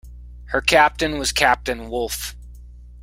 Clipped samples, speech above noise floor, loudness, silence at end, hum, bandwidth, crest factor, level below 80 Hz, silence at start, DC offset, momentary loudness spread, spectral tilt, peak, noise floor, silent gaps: under 0.1%; 21 dB; -19 LUFS; 0 s; 60 Hz at -35 dBFS; 16.5 kHz; 20 dB; -38 dBFS; 0.05 s; under 0.1%; 11 LU; -2.5 dB/octave; 0 dBFS; -40 dBFS; none